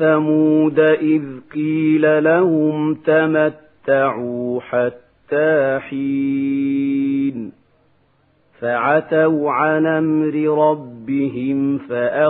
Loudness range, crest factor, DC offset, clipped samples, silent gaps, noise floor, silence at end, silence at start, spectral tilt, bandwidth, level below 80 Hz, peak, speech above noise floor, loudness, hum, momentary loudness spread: 4 LU; 14 dB; under 0.1%; under 0.1%; none; -59 dBFS; 0 s; 0 s; -11.5 dB/octave; 4 kHz; -62 dBFS; -2 dBFS; 42 dB; -17 LUFS; none; 9 LU